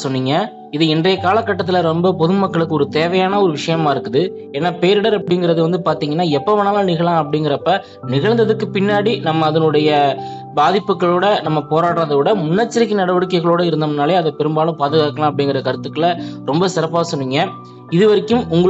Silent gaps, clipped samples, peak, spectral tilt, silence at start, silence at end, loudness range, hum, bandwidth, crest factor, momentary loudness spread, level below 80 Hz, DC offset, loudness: none; under 0.1%; -2 dBFS; -6.5 dB/octave; 0 s; 0 s; 2 LU; none; 8.2 kHz; 14 dB; 5 LU; -58 dBFS; under 0.1%; -16 LUFS